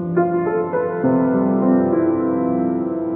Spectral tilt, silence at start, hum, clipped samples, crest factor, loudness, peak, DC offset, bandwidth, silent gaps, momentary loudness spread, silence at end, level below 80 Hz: -11 dB/octave; 0 s; none; under 0.1%; 12 dB; -18 LUFS; -4 dBFS; under 0.1%; 2.6 kHz; none; 4 LU; 0 s; -56 dBFS